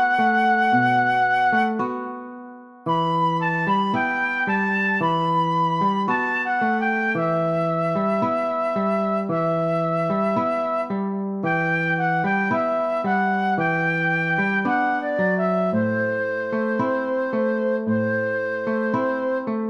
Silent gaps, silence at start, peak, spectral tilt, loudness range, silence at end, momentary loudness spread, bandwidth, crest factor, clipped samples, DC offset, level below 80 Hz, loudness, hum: none; 0 s; -8 dBFS; -7.5 dB/octave; 2 LU; 0 s; 6 LU; 10.5 kHz; 14 dB; under 0.1%; under 0.1%; -70 dBFS; -22 LUFS; none